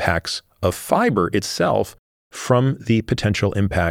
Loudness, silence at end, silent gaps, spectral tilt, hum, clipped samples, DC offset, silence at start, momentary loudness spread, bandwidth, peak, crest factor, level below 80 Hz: -20 LUFS; 0 s; 1.99-2.30 s; -5.5 dB/octave; none; under 0.1%; under 0.1%; 0 s; 8 LU; 16.5 kHz; 0 dBFS; 20 dB; -42 dBFS